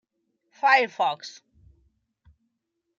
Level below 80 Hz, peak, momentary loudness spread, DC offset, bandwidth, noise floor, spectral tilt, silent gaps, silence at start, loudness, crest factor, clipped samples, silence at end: -68 dBFS; -6 dBFS; 17 LU; under 0.1%; 7.6 kHz; -80 dBFS; -2 dB/octave; none; 0.65 s; -22 LUFS; 22 dB; under 0.1%; 1.65 s